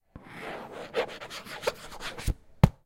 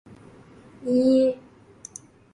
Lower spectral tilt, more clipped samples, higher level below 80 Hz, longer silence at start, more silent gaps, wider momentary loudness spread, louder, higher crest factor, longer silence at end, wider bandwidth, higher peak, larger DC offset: about the same, -6 dB/octave vs -6 dB/octave; neither; first, -40 dBFS vs -64 dBFS; second, 0.15 s vs 0.8 s; neither; second, 13 LU vs 24 LU; second, -34 LUFS vs -21 LUFS; first, 28 dB vs 16 dB; second, 0.1 s vs 1 s; first, 16.5 kHz vs 11 kHz; first, -2 dBFS vs -10 dBFS; neither